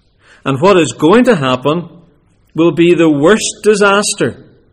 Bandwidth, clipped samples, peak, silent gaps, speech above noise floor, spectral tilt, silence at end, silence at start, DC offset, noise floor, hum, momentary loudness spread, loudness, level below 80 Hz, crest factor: 12.5 kHz; under 0.1%; 0 dBFS; none; 40 dB; -4.5 dB/octave; 0.4 s; 0.45 s; under 0.1%; -50 dBFS; none; 10 LU; -11 LUFS; -46 dBFS; 12 dB